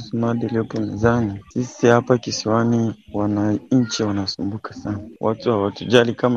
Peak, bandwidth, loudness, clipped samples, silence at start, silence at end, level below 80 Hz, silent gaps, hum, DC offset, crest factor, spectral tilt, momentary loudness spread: 0 dBFS; 7.8 kHz; -20 LUFS; under 0.1%; 0 s; 0 s; -52 dBFS; none; none; under 0.1%; 20 dB; -6 dB/octave; 10 LU